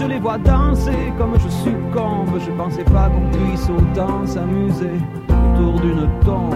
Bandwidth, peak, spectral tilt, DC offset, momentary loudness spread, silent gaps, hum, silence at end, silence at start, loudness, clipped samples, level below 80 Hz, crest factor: 12.5 kHz; 0 dBFS; -8.5 dB/octave; under 0.1%; 5 LU; none; none; 0 s; 0 s; -18 LUFS; under 0.1%; -20 dBFS; 16 dB